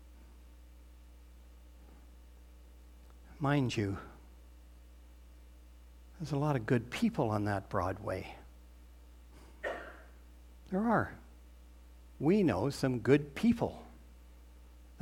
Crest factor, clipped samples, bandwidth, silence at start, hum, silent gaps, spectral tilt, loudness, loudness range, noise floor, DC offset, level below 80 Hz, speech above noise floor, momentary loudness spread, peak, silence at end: 24 dB; under 0.1%; 16.5 kHz; 0 s; 60 Hz at -55 dBFS; none; -7 dB/octave; -33 LUFS; 7 LU; -55 dBFS; under 0.1%; -56 dBFS; 23 dB; 24 LU; -14 dBFS; 0 s